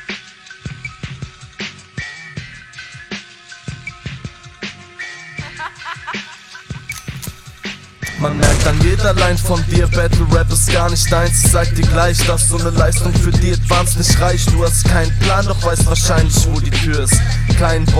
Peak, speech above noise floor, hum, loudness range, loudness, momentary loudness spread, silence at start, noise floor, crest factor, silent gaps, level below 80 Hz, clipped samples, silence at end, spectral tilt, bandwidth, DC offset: 0 dBFS; 25 dB; none; 16 LU; -14 LUFS; 18 LU; 0 s; -37 dBFS; 14 dB; none; -20 dBFS; under 0.1%; 0 s; -4.5 dB/octave; 16 kHz; under 0.1%